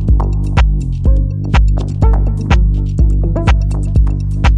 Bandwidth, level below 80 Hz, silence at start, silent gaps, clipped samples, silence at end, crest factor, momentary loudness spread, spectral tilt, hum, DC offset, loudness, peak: 7.2 kHz; -12 dBFS; 0 s; none; under 0.1%; 0 s; 10 dB; 2 LU; -7.5 dB/octave; 50 Hz at -15 dBFS; under 0.1%; -14 LUFS; -2 dBFS